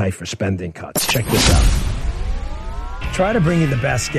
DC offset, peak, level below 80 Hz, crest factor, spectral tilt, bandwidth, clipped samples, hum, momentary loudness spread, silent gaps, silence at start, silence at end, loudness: under 0.1%; 0 dBFS; -22 dBFS; 18 dB; -4.5 dB/octave; 13.5 kHz; under 0.1%; none; 14 LU; none; 0 s; 0 s; -19 LUFS